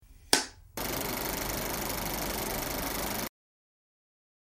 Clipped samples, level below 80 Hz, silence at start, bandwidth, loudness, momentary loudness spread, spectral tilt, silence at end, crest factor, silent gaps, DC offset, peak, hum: under 0.1%; -48 dBFS; 0 s; 16.5 kHz; -32 LUFS; 8 LU; -2.5 dB/octave; 1.2 s; 30 dB; none; under 0.1%; -4 dBFS; none